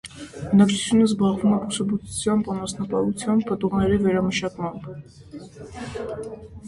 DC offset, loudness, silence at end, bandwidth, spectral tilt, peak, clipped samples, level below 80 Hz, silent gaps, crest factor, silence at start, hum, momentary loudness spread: under 0.1%; -22 LUFS; 0 s; 11.5 kHz; -5.5 dB/octave; -4 dBFS; under 0.1%; -48 dBFS; none; 18 dB; 0.05 s; none; 20 LU